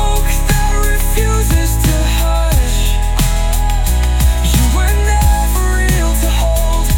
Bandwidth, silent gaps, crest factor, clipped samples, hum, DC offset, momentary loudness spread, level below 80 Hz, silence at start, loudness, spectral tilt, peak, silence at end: 18 kHz; none; 10 dB; under 0.1%; none; under 0.1%; 3 LU; -12 dBFS; 0 s; -14 LUFS; -4.5 dB/octave; 0 dBFS; 0 s